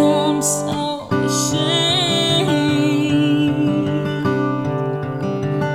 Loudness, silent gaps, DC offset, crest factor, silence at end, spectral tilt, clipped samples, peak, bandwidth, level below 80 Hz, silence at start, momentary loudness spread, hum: -18 LUFS; none; under 0.1%; 14 dB; 0 s; -4.5 dB/octave; under 0.1%; -4 dBFS; 15.5 kHz; -52 dBFS; 0 s; 7 LU; none